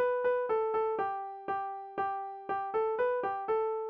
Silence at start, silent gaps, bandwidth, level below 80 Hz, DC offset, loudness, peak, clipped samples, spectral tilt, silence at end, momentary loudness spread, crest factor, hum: 0 s; none; 5.2 kHz; -72 dBFS; under 0.1%; -33 LUFS; -20 dBFS; under 0.1%; -2.5 dB/octave; 0 s; 7 LU; 12 dB; none